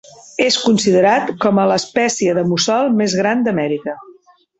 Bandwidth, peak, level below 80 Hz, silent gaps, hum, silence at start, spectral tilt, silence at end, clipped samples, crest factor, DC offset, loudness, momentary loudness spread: 8.2 kHz; -2 dBFS; -58 dBFS; none; none; 0.4 s; -4 dB/octave; 0.45 s; under 0.1%; 14 dB; under 0.1%; -15 LUFS; 8 LU